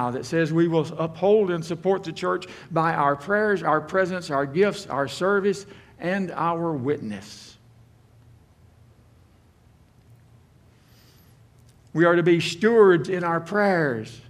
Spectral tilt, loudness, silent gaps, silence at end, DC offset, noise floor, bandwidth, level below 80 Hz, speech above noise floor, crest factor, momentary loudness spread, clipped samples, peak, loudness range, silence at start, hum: -6.5 dB/octave; -23 LUFS; none; 0.1 s; under 0.1%; -56 dBFS; 12.5 kHz; -62 dBFS; 33 dB; 20 dB; 10 LU; under 0.1%; -4 dBFS; 10 LU; 0 s; none